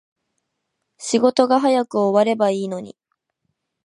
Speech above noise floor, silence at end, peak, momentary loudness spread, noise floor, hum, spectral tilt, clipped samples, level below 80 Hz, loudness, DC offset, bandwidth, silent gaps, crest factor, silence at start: 59 dB; 0.95 s; -2 dBFS; 12 LU; -76 dBFS; none; -5 dB/octave; under 0.1%; -74 dBFS; -18 LUFS; under 0.1%; 11 kHz; none; 20 dB; 1 s